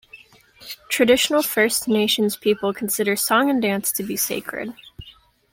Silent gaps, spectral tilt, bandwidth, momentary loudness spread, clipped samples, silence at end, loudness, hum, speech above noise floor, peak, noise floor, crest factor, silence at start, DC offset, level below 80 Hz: none; -3 dB/octave; 17 kHz; 14 LU; under 0.1%; 0.45 s; -20 LUFS; none; 29 dB; -4 dBFS; -49 dBFS; 18 dB; 0.15 s; under 0.1%; -56 dBFS